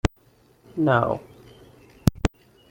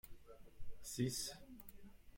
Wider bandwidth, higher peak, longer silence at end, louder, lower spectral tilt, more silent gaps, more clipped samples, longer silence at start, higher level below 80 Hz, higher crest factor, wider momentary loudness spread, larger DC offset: about the same, 16.5 kHz vs 16.5 kHz; first, -2 dBFS vs -28 dBFS; first, 0.45 s vs 0 s; first, -25 LUFS vs -45 LUFS; first, -6.5 dB/octave vs -4 dB/octave; neither; neither; about the same, 0.05 s vs 0.05 s; first, -38 dBFS vs -62 dBFS; about the same, 24 dB vs 20 dB; second, 11 LU vs 23 LU; neither